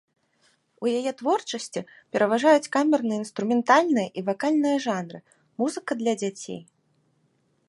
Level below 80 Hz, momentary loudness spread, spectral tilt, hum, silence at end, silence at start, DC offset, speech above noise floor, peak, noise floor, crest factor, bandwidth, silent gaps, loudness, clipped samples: -76 dBFS; 15 LU; -4.5 dB/octave; none; 1.05 s; 0.8 s; under 0.1%; 44 dB; -4 dBFS; -68 dBFS; 20 dB; 11.5 kHz; none; -24 LUFS; under 0.1%